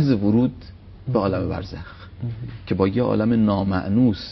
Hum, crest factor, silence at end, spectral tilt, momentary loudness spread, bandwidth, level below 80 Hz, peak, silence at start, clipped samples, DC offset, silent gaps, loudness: none; 18 dB; 0 s; -9.5 dB/octave; 17 LU; 6 kHz; -44 dBFS; -4 dBFS; 0 s; under 0.1%; under 0.1%; none; -21 LUFS